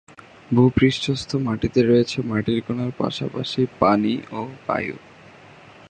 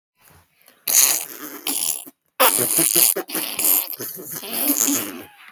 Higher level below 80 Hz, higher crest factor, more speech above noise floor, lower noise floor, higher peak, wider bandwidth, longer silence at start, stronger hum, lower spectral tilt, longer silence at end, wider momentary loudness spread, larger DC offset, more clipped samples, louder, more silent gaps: first, -48 dBFS vs -74 dBFS; about the same, 20 dB vs 22 dB; second, 25 dB vs 33 dB; second, -46 dBFS vs -55 dBFS; about the same, -2 dBFS vs 0 dBFS; second, 9.4 kHz vs over 20 kHz; second, 0.5 s vs 0.85 s; neither; first, -6.5 dB/octave vs -0.5 dB/octave; first, 0.95 s vs 0.25 s; second, 10 LU vs 16 LU; neither; neither; second, -21 LUFS vs -17 LUFS; neither